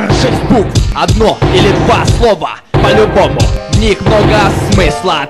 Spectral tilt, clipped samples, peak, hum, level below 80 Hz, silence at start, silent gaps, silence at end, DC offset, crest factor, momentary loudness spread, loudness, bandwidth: -5.5 dB/octave; under 0.1%; 0 dBFS; none; -18 dBFS; 0 s; none; 0 s; under 0.1%; 8 dB; 4 LU; -9 LUFS; 13.5 kHz